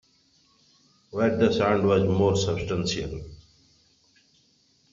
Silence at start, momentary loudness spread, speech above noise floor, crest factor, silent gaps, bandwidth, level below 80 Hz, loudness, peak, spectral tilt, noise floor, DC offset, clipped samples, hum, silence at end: 1.15 s; 15 LU; 41 dB; 20 dB; none; 7.6 kHz; -52 dBFS; -24 LUFS; -6 dBFS; -5.5 dB/octave; -64 dBFS; under 0.1%; under 0.1%; none; 1.55 s